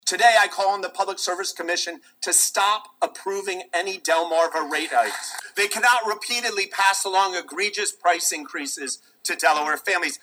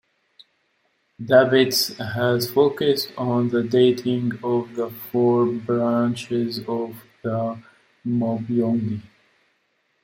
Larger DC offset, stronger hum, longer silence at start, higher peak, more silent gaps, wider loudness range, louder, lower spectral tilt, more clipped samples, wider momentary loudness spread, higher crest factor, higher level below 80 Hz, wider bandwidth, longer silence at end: neither; neither; second, 0.05 s vs 1.2 s; about the same, -2 dBFS vs -2 dBFS; neither; second, 2 LU vs 6 LU; about the same, -22 LUFS vs -21 LUFS; second, 1 dB/octave vs -5.5 dB/octave; neither; about the same, 10 LU vs 12 LU; about the same, 20 dB vs 20 dB; second, -90 dBFS vs -64 dBFS; first, over 20 kHz vs 16.5 kHz; second, 0.05 s vs 1 s